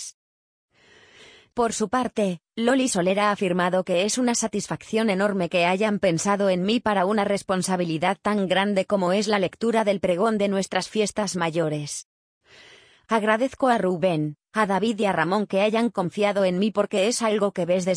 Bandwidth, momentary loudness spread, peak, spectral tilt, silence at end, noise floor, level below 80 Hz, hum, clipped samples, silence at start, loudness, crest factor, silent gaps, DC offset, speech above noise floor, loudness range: 10.5 kHz; 4 LU; -6 dBFS; -4.5 dB/octave; 0 s; -54 dBFS; -62 dBFS; none; under 0.1%; 0 s; -23 LUFS; 16 dB; 0.14-0.69 s, 12.05-12.41 s; under 0.1%; 32 dB; 3 LU